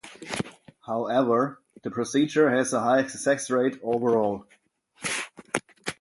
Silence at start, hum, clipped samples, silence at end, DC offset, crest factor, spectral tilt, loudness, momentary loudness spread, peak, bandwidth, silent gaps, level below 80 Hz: 0.05 s; none; under 0.1%; 0.05 s; under 0.1%; 22 dB; -4.5 dB/octave; -26 LUFS; 13 LU; -4 dBFS; 11.5 kHz; none; -66 dBFS